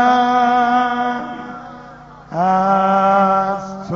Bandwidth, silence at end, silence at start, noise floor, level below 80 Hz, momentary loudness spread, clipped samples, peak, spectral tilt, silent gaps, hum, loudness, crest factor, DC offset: 7.2 kHz; 0 s; 0 s; -38 dBFS; -52 dBFS; 16 LU; under 0.1%; -2 dBFS; -4 dB/octave; none; none; -15 LUFS; 14 dB; under 0.1%